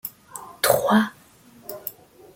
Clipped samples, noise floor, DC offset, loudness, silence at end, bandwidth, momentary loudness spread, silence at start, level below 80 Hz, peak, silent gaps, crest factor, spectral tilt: under 0.1%; -51 dBFS; under 0.1%; -22 LUFS; 0.45 s; 17 kHz; 21 LU; 0.05 s; -60 dBFS; -4 dBFS; none; 22 dB; -4 dB/octave